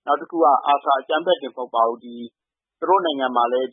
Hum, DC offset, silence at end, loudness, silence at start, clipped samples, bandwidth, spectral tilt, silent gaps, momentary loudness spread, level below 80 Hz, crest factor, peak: none; under 0.1%; 0.05 s; -20 LUFS; 0.05 s; under 0.1%; 3.8 kHz; -8 dB/octave; none; 15 LU; -88 dBFS; 16 dB; -4 dBFS